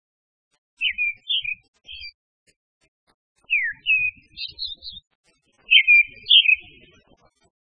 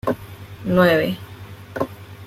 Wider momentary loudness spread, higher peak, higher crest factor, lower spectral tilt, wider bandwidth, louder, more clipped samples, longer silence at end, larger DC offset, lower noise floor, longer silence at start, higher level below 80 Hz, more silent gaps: about the same, 24 LU vs 22 LU; about the same, -2 dBFS vs -4 dBFS; about the same, 22 dB vs 18 dB; second, 0 dB/octave vs -7 dB/octave; second, 5.8 kHz vs 16 kHz; first, -17 LUFS vs -21 LUFS; neither; first, 1 s vs 0 s; neither; first, -60 dBFS vs -38 dBFS; first, 0.8 s vs 0.05 s; second, -60 dBFS vs -50 dBFS; first, 1.68-1.73 s, 2.14-2.46 s, 2.56-2.81 s, 2.88-3.07 s, 3.14-3.36 s, 5.07-5.24 s vs none